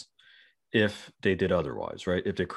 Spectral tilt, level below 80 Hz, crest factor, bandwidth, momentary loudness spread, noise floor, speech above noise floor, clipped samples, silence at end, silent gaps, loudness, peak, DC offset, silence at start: -6.5 dB/octave; -56 dBFS; 18 dB; 12 kHz; 6 LU; -60 dBFS; 32 dB; under 0.1%; 0 s; none; -29 LUFS; -10 dBFS; under 0.1%; 0 s